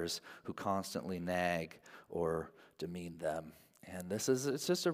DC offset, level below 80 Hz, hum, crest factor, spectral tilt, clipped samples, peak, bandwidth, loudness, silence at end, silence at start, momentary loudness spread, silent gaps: under 0.1%; -72 dBFS; none; 18 dB; -4.5 dB/octave; under 0.1%; -20 dBFS; 16 kHz; -39 LUFS; 0 s; 0 s; 15 LU; none